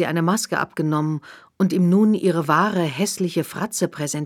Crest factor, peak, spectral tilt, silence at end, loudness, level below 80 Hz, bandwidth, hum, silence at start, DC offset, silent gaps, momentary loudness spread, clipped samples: 16 dB; -4 dBFS; -5.5 dB/octave; 0 s; -21 LUFS; -66 dBFS; 16.5 kHz; none; 0 s; under 0.1%; none; 8 LU; under 0.1%